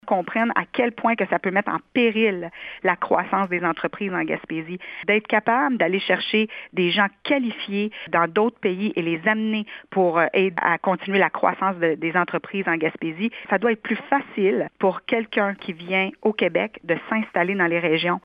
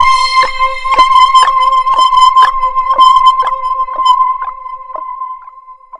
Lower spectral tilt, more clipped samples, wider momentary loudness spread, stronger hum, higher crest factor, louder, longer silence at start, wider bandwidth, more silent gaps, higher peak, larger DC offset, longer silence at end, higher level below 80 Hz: first, -8.5 dB/octave vs 0 dB/octave; second, under 0.1% vs 0.3%; second, 7 LU vs 18 LU; neither; first, 20 dB vs 10 dB; second, -22 LUFS vs -8 LUFS; about the same, 0.05 s vs 0 s; second, 5.2 kHz vs 11 kHz; neither; about the same, -2 dBFS vs 0 dBFS; neither; about the same, 0.05 s vs 0.05 s; second, -68 dBFS vs -36 dBFS